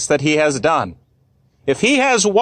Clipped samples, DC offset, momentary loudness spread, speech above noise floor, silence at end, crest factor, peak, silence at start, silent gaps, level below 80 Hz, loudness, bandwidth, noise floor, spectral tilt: under 0.1%; under 0.1%; 11 LU; 42 dB; 0 s; 12 dB; -4 dBFS; 0 s; none; -52 dBFS; -16 LUFS; 10 kHz; -58 dBFS; -3.5 dB/octave